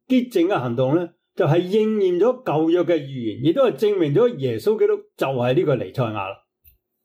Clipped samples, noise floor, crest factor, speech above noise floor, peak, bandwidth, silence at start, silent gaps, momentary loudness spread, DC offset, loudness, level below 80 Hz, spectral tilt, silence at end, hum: under 0.1%; -58 dBFS; 12 dB; 38 dB; -8 dBFS; 16 kHz; 0.1 s; none; 6 LU; under 0.1%; -20 LUFS; -66 dBFS; -8 dB/octave; 0.7 s; none